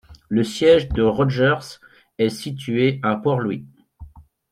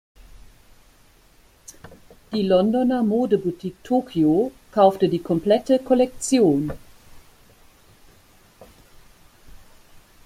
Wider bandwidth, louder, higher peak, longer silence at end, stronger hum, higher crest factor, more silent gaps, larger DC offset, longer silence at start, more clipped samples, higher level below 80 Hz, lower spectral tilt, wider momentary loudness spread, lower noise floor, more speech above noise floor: second, 14 kHz vs 15.5 kHz; about the same, -20 LUFS vs -20 LUFS; about the same, -4 dBFS vs -4 dBFS; second, 0.3 s vs 0.75 s; neither; about the same, 16 dB vs 18 dB; neither; neither; second, 0.1 s vs 2.3 s; neither; first, -42 dBFS vs -52 dBFS; about the same, -6.5 dB/octave vs -6 dB/octave; about the same, 11 LU vs 12 LU; second, -43 dBFS vs -54 dBFS; second, 24 dB vs 35 dB